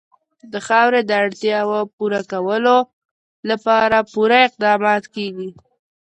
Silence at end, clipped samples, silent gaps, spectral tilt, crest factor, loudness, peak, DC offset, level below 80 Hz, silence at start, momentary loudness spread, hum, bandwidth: 0.5 s; under 0.1%; 1.93-1.98 s, 2.93-3.43 s; -4.5 dB/octave; 16 dB; -17 LUFS; -2 dBFS; under 0.1%; -62 dBFS; 0.45 s; 16 LU; none; 9.4 kHz